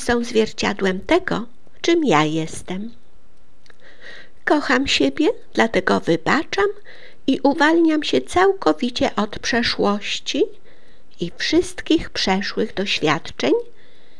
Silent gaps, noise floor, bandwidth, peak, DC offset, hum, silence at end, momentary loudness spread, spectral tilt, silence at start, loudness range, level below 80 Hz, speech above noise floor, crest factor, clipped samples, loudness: none; -56 dBFS; 12 kHz; -2 dBFS; 3%; none; 0.55 s; 12 LU; -4.5 dB/octave; 0 s; 4 LU; -46 dBFS; 36 dB; 20 dB; under 0.1%; -19 LUFS